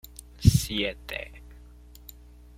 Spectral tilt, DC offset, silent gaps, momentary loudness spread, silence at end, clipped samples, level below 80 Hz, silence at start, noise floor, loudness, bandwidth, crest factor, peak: -5 dB/octave; under 0.1%; none; 25 LU; 0.95 s; under 0.1%; -38 dBFS; 0.4 s; -49 dBFS; -26 LUFS; 16.5 kHz; 26 dB; -4 dBFS